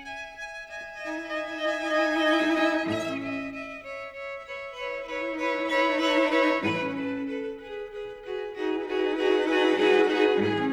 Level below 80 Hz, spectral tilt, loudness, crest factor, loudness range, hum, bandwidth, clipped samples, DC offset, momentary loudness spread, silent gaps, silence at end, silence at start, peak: -60 dBFS; -4.5 dB/octave; -26 LUFS; 18 dB; 4 LU; none; 12 kHz; under 0.1%; under 0.1%; 15 LU; none; 0 s; 0 s; -10 dBFS